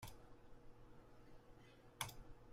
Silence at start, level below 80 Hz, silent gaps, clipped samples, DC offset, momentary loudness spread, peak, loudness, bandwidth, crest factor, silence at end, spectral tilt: 0 s; -66 dBFS; none; under 0.1%; under 0.1%; 16 LU; -26 dBFS; -57 LUFS; 16 kHz; 30 dB; 0 s; -2.5 dB/octave